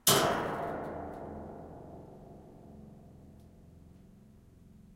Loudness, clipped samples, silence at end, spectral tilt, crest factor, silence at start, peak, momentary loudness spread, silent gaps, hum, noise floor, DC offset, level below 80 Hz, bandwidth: -33 LUFS; under 0.1%; 0 s; -2.5 dB/octave; 30 dB; 0.05 s; -6 dBFS; 26 LU; none; none; -57 dBFS; under 0.1%; -60 dBFS; 16 kHz